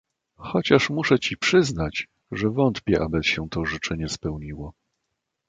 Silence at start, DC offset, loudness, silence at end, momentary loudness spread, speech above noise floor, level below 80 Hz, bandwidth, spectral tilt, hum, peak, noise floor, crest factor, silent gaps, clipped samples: 0.4 s; under 0.1%; -23 LUFS; 0.75 s; 14 LU; 57 dB; -44 dBFS; 9.2 kHz; -5 dB/octave; none; -4 dBFS; -80 dBFS; 20 dB; none; under 0.1%